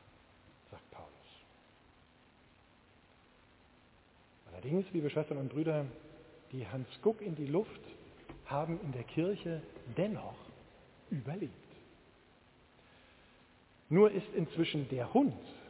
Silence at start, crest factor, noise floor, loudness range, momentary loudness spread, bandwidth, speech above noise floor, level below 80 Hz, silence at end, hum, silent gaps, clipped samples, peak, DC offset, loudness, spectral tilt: 0.7 s; 24 dB; -65 dBFS; 10 LU; 24 LU; 4 kHz; 30 dB; -68 dBFS; 0 s; none; none; under 0.1%; -14 dBFS; under 0.1%; -36 LUFS; -6.5 dB/octave